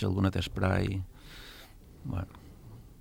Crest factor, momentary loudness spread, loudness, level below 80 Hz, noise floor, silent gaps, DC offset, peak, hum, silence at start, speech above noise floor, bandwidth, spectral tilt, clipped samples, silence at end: 20 dB; 22 LU; -32 LUFS; -50 dBFS; -51 dBFS; none; under 0.1%; -14 dBFS; none; 0 s; 21 dB; 16.5 kHz; -7 dB/octave; under 0.1%; 0.05 s